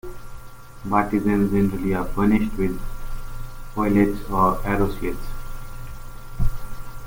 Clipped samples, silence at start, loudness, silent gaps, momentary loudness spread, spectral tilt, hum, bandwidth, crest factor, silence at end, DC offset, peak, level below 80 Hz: under 0.1%; 0.05 s; -22 LUFS; none; 20 LU; -7.5 dB/octave; none; 17 kHz; 16 dB; 0 s; under 0.1%; -6 dBFS; -30 dBFS